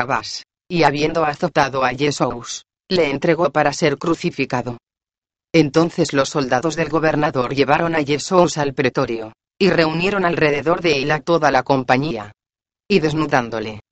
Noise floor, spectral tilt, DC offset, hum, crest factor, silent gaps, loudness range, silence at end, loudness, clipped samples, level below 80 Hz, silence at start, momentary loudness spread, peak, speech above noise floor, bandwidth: under -90 dBFS; -5 dB/octave; under 0.1%; none; 18 dB; 5.18-5.22 s; 2 LU; 0.1 s; -18 LUFS; under 0.1%; -48 dBFS; 0 s; 10 LU; 0 dBFS; over 72 dB; 8.8 kHz